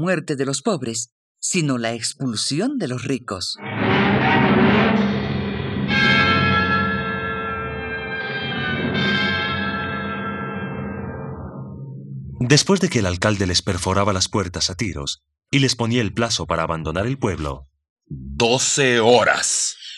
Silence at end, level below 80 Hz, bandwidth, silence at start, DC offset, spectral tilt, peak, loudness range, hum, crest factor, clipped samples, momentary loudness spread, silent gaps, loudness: 0 s; -46 dBFS; 12.5 kHz; 0 s; under 0.1%; -4 dB/octave; -2 dBFS; 6 LU; none; 20 dB; under 0.1%; 14 LU; 1.12-1.35 s, 17.90-17.96 s; -20 LUFS